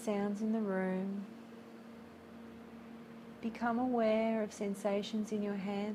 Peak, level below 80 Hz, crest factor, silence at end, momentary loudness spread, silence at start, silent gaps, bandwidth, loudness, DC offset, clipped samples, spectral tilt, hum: -22 dBFS; -74 dBFS; 16 dB; 0 s; 20 LU; 0 s; none; 13 kHz; -36 LUFS; under 0.1%; under 0.1%; -6.5 dB/octave; none